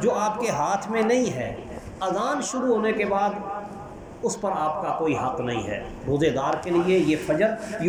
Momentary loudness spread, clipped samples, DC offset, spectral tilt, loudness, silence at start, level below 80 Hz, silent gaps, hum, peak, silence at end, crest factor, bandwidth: 11 LU; under 0.1%; under 0.1%; -5 dB/octave; -25 LUFS; 0 s; -50 dBFS; none; none; -8 dBFS; 0 s; 16 dB; 19 kHz